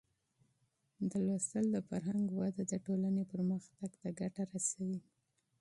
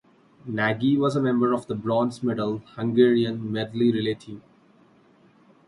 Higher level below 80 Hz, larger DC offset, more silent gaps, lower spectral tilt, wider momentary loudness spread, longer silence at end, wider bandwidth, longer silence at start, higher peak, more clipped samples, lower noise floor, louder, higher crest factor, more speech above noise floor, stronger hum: second, -76 dBFS vs -64 dBFS; neither; neither; about the same, -6.5 dB/octave vs -7.5 dB/octave; second, 7 LU vs 12 LU; second, 0.6 s vs 1.3 s; about the same, 11.5 kHz vs 11.5 kHz; first, 1 s vs 0.45 s; second, -22 dBFS vs -6 dBFS; neither; first, -79 dBFS vs -57 dBFS; second, -38 LUFS vs -24 LUFS; about the same, 16 dB vs 18 dB; first, 42 dB vs 34 dB; neither